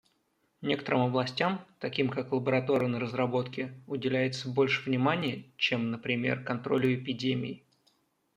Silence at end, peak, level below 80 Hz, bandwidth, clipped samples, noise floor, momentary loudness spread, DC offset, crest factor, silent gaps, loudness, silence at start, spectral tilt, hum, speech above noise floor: 0.8 s; -10 dBFS; -72 dBFS; 9.6 kHz; under 0.1%; -74 dBFS; 8 LU; under 0.1%; 20 dB; none; -30 LUFS; 0.6 s; -6.5 dB/octave; none; 44 dB